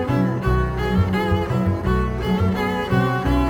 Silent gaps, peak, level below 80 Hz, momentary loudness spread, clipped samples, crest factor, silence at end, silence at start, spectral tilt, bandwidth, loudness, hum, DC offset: none; -6 dBFS; -28 dBFS; 2 LU; under 0.1%; 14 dB; 0 s; 0 s; -7.5 dB/octave; 17.5 kHz; -21 LUFS; none; under 0.1%